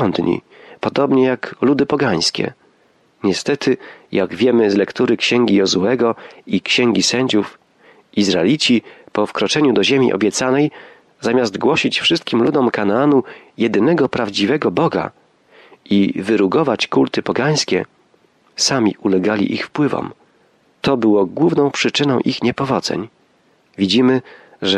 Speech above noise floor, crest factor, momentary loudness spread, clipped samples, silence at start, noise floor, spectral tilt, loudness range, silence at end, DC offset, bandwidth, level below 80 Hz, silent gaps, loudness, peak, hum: 41 dB; 12 dB; 9 LU; under 0.1%; 0 s; -57 dBFS; -4.5 dB/octave; 2 LU; 0 s; under 0.1%; 12 kHz; -58 dBFS; none; -16 LUFS; -4 dBFS; none